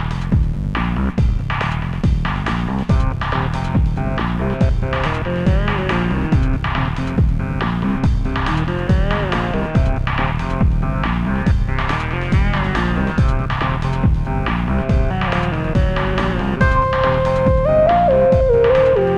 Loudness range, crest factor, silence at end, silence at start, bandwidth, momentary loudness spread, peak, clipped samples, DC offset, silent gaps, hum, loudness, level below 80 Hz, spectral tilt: 3 LU; 14 dB; 0 s; 0 s; 8.8 kHz; 7 LU; -2 dBFS; under 0.1%; under 0.1%; none; none; -18 LUFS; -22 dBFS; -8 dB/octave